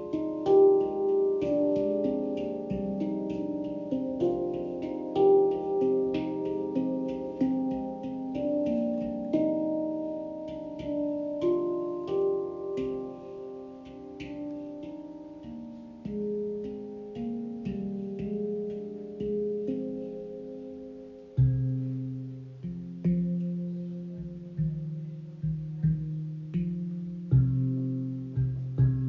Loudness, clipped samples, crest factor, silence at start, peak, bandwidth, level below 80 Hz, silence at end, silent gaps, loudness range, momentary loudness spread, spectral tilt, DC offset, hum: -30 LUFS; under 0.1%; 18 dB; 0 s; -12 dBFS; 6.6 kHz; -52 dBFS; 0 s; none; 9 LU; 14 LU; -11 dB/octave; under 0.1%; none